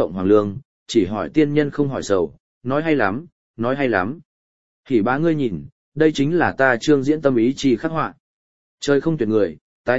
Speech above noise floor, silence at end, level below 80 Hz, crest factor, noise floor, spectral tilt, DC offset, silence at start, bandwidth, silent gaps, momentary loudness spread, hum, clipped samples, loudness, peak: over 71 dB; 0 s; -52 dBFS; 18 dB; under -90 dBFS; -6.5 dB/octave; 1%; 0 s; 8 kHz; 0.65-0.86 s, 2.40-2.61 s, 3.32-3.54 s, 4.25-4.83 s, 5.72-5.92 s, 8.20-8.78 s, 9.61-9.84 s; 11 LU; none; under 0.1%; -20 LUFS; -2 dBFS